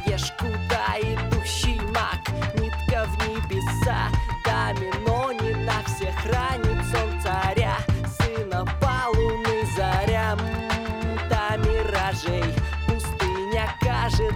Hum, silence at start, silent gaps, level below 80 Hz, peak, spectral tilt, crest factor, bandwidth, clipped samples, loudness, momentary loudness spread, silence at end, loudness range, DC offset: none; 0 s; none; -30 dBFS; -8 dBFS; -5.5 dB/octave; 16 dB; 16.5 kHz; under 0.1%; -25 LUFS; 4 LU; 0 s; 1 LU; under 0.1%